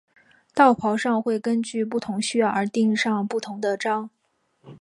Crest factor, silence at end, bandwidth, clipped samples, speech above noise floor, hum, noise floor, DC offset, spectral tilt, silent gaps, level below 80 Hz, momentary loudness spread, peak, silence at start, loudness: 20 dB; 0.05 s; 11.5 kHz; under 0.1%; 42 dB; none; -64 dBFS; under 0.1%; -5 dB/octave; none; -70 dBFS; 9 LU; -4 dBFS; 0.55 s; -23 LUFS